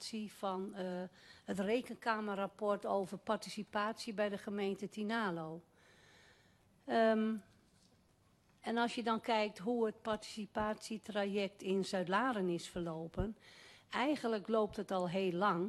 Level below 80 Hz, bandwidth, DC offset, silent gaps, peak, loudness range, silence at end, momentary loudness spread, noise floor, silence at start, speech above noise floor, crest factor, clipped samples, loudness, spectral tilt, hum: -64 dBFS; 13 kHz; under 0.1%; none; -20 dBFS; 3 LU; 0 s; 10 LU; -71 dBFS; 0 s; 33 dB; 18 dB; under 0.1%; -38 LUFS; -5.5 dB/octave; none